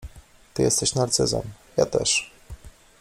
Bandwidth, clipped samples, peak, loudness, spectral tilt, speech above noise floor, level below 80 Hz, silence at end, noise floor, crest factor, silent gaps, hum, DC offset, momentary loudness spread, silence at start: 15.5 kHz; under 0.1%; -6 dBFS; -23 LUFS; -3 dB/octave; 25 dB; -46 dBFS; 0.3 s; -48 dBFS; 18 dB; none; none; under 0.1%; 9 LU; 0 s